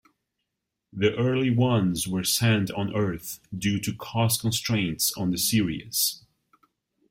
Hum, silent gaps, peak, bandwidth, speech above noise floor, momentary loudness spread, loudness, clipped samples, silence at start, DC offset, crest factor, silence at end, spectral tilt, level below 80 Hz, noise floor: none; none; -8 dBFS; 16.5 kHz; 58 dB; 7 LU; -25 LUFS; under 0.1%; 0.95 s; under 0.1%; 18 dB; 0.9 s; -4.5 dB/octave; -56 dBFS; -83 dBFS